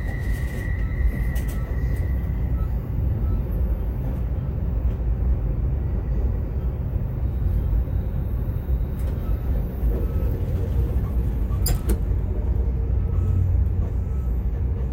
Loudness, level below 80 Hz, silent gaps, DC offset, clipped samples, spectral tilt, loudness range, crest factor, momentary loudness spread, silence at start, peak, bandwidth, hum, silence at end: -26 LUFS; -24 dBFS; none; under 0.1%; under 0.1%; -7.5 dB/octave; 2 LU; 14 dB; 4 LU; 0 s; -10 dBFS; 16 kHz; none; 0 s